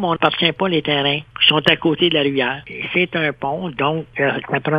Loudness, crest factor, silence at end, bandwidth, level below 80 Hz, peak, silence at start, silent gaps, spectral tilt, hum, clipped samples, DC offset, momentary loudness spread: -17 LUFS; 18 dB; 0 s; 9.6 kHz; -54 dBFS; 0 dBFS; 0 s; none; -6.5 dB/octave; none; under 0.1%; under 0.1%; 7 LU